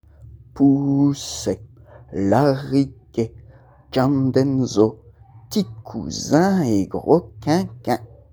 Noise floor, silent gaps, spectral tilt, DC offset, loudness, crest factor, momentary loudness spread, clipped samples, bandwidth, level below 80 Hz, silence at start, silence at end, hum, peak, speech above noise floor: -47 dBFS; none; -6.5 dB/octave; under 0.1%; -20 LUFS; 20 dB; 10 LU; under 0.1%; over 20 kHz; -50 dBFS; 0.2 s; 0.25 s; none; -2 dBFS; 28 dB